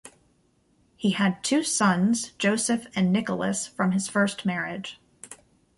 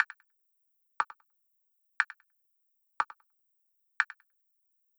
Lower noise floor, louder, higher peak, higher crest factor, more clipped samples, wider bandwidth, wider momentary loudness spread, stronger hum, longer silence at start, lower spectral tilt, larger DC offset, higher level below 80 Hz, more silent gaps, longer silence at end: second, -65 dBFS vs -76 dBFS; first, -25 LUFS vs -34 LUFS; about the same, -10 dBFS vs -10 dBFS; second, 16 dB vs 30 dB; neither; second, 11.5 kHz vs over 20 kHz; second, 16 LU vs 20 LU; neither; about the same, 0.05 s vs 0 s; first, -4.5 dB/octave vs 0.5 dB/octave; neither; first, -64 dBFS vs -86 dBFS; neither; second, 0.45 s vs 0.95 s